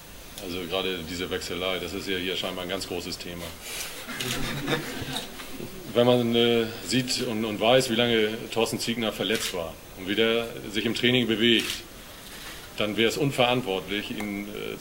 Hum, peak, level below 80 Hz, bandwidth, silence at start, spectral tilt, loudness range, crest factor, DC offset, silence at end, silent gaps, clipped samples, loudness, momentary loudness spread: none; -6 dBFS; -50 dBFS; 16.5 kHz; 0 s; -4 dB/octave; 7 LU; 20 dB; under 0.1%; 0 s; none; under 0.1%; -26 LUFS; 16 LU